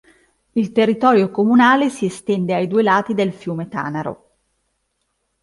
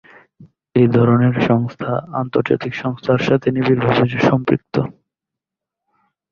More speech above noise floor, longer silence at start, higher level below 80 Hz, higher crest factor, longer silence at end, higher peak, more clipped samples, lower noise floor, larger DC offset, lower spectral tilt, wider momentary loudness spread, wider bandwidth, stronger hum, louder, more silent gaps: second, 54 dB vs 69 dB; first, 0.55 s vs 0.4 s; second, -62 dBFS vs -52 dBFS; about the same, 16 dB vs 18 dB; about the same, 1.3 s vs 1.4 s; about the same, -2 dBFS vs 0 dBFS; neither; second, -71 dBFS vs -85 dBFS; neither; second, -6.5 dB/octave vs -8.5 dB/octave; first, 12 LU vs 9 LU; first, 11.5 kHz vs 7 kHz; neither; about the same, -17 LUFS vs -17 LUFS; neither